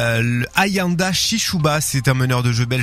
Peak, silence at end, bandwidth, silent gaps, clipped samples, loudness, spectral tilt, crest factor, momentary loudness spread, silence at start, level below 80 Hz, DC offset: -2 dBFS; 0 s; 16 kHz; none; under 0.1%; -17 LUFS; -4 dB/octave; 16 dB; 2 LU; 0 s; -42 dBFS; under 0.1%